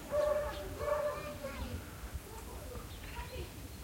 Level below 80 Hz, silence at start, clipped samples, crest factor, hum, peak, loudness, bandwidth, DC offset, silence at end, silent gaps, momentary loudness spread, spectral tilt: -50 dBFS; 0 s; under 0.1%; 16 dB; none; -22 dBFS; -40 LUFS; 16.5 kHz; under 0.1%; 0 s; none; 12 LU; -5 dB/octave